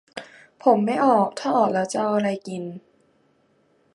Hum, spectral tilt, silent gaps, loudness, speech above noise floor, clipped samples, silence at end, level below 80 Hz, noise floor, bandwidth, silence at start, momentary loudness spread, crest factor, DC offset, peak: none; -6 dB/octave; none; -22 LUFS; 42 dB; under 0.1%; 1.15 s; -72 dBFS; -63 dBFS; 11.5 kHz; 0.15 s; 19 LU; 20 dB; under 0.1%; -4 dBFS